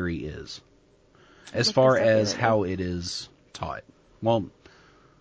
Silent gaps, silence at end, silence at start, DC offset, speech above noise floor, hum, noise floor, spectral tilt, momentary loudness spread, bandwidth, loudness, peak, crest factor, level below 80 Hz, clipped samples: none; 0.7 s; 0 s; under 0.1%; 34 dB; none; -59 dBFS; -5 dB/octave; 20 LU; 8 kHz; -25 LUFS; -8 dBFS; 20 dB; -48 dBFS; under 0.1%